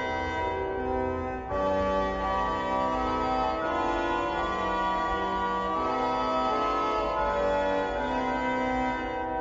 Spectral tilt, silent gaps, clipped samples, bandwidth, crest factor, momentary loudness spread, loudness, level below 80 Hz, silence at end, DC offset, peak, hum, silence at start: -6 dB/octave; none; under 0.1%; 7.8 kHz; 12 dB; 3 LU; -28 LUFS; -44 dBFS; 0 s; under 0.1%; -16 dBFS; none; 0 s